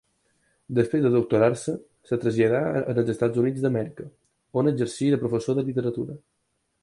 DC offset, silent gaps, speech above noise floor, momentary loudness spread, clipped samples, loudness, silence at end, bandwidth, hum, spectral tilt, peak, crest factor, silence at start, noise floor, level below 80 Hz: under 0.1%; none; 51 dB; 13 LU; under 0.1%; -24 LUFS; 0.65 s; 11.5 kHz; none; -7.5 dB/octave; -6 dBFS; 18 dB; 0.7 s; -74 dBFS; -60 dBFS